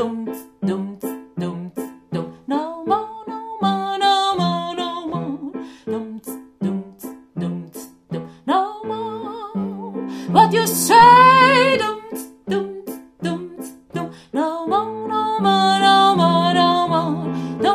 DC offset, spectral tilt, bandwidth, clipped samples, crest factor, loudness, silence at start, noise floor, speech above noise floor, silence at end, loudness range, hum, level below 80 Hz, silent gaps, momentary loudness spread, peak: under 0.1%; -4.5 dB/octave; 15.5 kHz; under 0.1%; 18 dB; -18 LUFS; 0 s; -38 dBFS; 13 dB; 0 s; 12 LU; none; -58 dBFS; none; 19 LU; 0 dBFS